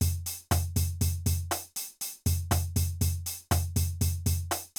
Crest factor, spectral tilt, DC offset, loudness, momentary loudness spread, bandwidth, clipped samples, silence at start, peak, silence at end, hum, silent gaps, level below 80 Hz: 16 dB; -4.5 dB/octave; under 0.1%; -30 LUFS; 6 LU; over 20 kHz; under 0.1%; 0 s; -12 dBFS; 0.1 s; none; none; -42 dBFS